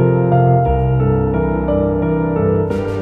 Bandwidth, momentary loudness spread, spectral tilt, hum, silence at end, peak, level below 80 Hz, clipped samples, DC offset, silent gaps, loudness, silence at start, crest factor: 3.8 kHz; 4 LU; -11 dB/octave; none; 0 s; -2 dBFS; -26 dBFS; under 0.1%; under 0.1%; none; -15 LUFS; 0 s; 12 dB